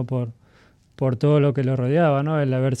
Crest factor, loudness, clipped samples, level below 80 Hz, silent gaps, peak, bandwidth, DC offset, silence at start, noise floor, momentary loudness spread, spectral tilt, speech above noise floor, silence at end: 14 dB; -21 LUFS; under 0.1%; -60 dBFS; none; -8 dBFS; 8.4 kHz; under 0.1%; 0 s; -55 dBFS; 8 LU; -8.5 dB/octave; 36 dB; 0 s